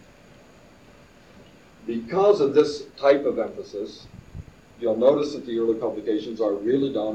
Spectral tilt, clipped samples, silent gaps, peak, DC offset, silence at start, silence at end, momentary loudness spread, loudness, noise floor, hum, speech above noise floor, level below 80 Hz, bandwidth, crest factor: -6.5 dB/octave; under 0.1%; none; -6 dBFS; under 0.1%; 1.85 s; 0 s; 20 LU; -23 LUFS; -51 dBFS; none; 28 dB; -56 dBFS; 8.6 kHz; 20 dB